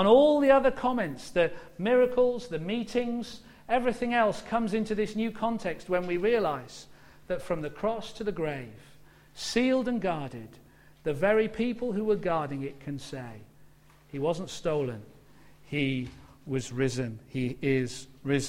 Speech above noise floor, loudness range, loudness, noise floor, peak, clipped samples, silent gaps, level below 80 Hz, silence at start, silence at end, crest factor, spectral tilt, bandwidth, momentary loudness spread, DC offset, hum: 28 dB; 6 LU; -29 LUFS; -56 dBFS; -8 dBFS; under 0.1%; none; -54 dBFS; 0 s; 0 s; 20 dB; -6 dB/octave; 15.5 kHz; 14 LU; under 0.1%; none